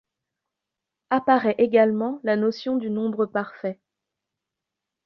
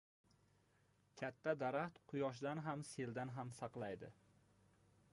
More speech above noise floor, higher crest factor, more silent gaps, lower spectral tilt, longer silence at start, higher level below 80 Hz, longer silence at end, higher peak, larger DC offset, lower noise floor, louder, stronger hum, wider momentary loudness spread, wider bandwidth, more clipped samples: first, 63 dB vs 31 dB; about the same, 20 dB vs 20 dB; neither; first, -7.5 dB/octave vs -6 dB/octave; about the same, 1.1 s vs 1.15 s; first, -70 dBFS vs -82 dBFS; first, 1.3 s vs 1 s; first, -6 dBFS vs -28 dBFS; neither; first, -85 dBFS vs -77 dBFS; first, -23 LUFS vs -46 LUFS; neither; about the same, 10 LU vs 8 LU; second, 6.2 kHz vs 11 kHz; neither